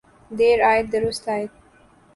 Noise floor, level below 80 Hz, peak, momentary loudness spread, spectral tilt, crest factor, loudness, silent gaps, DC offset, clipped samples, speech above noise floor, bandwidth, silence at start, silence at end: -53 dBFS; -50 dBFS; -6 dBFS; 15 LU; -4.5 dB/octave; 16 dB; -20 LUFS; none; under 0.1%; under 0.1%; 34 dB; 11.5 kHz; 0.3 s; 0.65 s